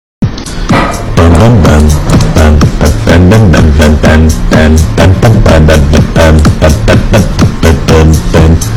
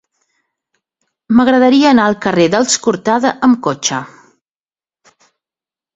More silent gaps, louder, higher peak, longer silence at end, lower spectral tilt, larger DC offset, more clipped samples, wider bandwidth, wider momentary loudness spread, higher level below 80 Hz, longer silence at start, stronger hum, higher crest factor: neither; first, -5 LUFS vs -12 LUFS; about the same, 0 dBFS vs 0 dBFS; second, 0 s vs 1.9 s; first, -6.5 dB/octave vs -4 dB/octave; first, 2% vs under 0.1%; first, 30% vs under 0.1%; first, 14 kHz vs 8 kHz; about the same, 5 LU vs 7 LU; first, -10 dBFS vs -54 dBFS; second, 0.2 s vs 1.3 s; neither; second, 4 dB vs 14 dB